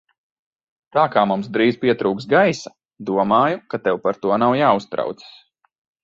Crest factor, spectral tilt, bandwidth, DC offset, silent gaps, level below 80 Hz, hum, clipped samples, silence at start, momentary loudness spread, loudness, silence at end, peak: 18 dB; -6 dB/octave; 7.8 kHz; under 0.1%; 2.85-2.89 s; -62 dBFS; none; under 0.1%; 0.95 s; 11 LU; -19 LUFS; 0.75 s; -2 dBFS